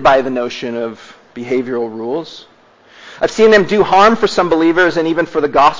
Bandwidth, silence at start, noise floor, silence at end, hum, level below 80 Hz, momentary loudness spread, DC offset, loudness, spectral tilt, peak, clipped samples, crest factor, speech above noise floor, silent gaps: 7.6 kHz; 0 s; -45 dBFS; 0 s; none; -46 dBFS; 14 LU; under 0.1%; -13 LUFS; -5 dB/octave; 0 dBFS; under 0.1%; 14 dB; 32 dB; none